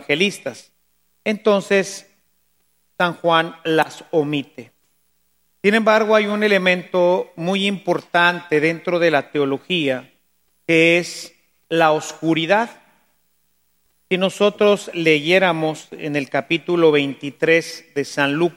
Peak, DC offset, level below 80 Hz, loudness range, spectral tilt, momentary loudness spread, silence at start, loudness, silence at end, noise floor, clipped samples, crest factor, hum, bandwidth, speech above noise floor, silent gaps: 0 dBFS; under 0.1%; -72 dBFS; 4 LU; -5 dB/octave; 11 LU; 0 s; -18 LUFS; 0.05 s; -66 dBFS; under 0.1%; 20 dB; none; 16.5 kHz; 48 dB; none